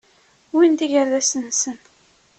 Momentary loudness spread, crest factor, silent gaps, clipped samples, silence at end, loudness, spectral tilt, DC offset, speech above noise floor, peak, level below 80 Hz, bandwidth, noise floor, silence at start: 9 LU; 16 dB; none; under 0.1%; 0.65 s; -19 LUFS; -1.5 dB/octave; under 0.1%; 39 dB; -6 dBFS; -68 dBFS; 8.8 kHz; -57 dBFS; 0.55 s